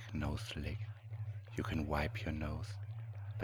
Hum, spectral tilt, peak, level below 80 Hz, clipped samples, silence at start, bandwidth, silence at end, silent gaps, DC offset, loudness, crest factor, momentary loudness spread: none; -6.5 dB/octave; -22 dBFS; -50 dBFS; under 0.1%; 0 s; 16.5 kHz; 0 s; none; under 0.1%; -42 LUFS; 20 dB; 9 LU